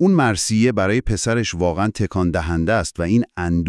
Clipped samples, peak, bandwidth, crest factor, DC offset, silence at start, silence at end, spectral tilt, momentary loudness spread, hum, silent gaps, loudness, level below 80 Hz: under 0.1%; -2 dBFS; 12 kHz; 16 dB; under 0.1%; 0 s; 0 s; -5.5 dB/octave; 4 LU; none; none; -19 LUFS; -36 dBFS